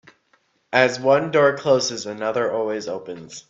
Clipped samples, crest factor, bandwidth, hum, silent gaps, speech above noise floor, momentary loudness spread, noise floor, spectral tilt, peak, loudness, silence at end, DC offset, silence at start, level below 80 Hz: under 0.1%; 20 dB; 7.8 kHz; none; none; 44 dB; 12 LU; -64 dBFS; -4 dB/octave; 0 dBFS; -20 LUFS; 0.1 s; under 0.1%; 0.7 s; -66 dBFS